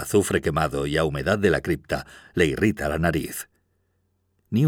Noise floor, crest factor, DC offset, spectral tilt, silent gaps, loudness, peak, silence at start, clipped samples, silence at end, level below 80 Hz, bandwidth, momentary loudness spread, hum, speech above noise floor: -70 dBFS; 18 dB; under 0.1%; -5.5 dB/octave; none; -24 LUFS; -6 dBFS; 0 s; under 0.1%; 0 s; -42 dBFS; 18.5 kHz; 10 LU; none; 47 dB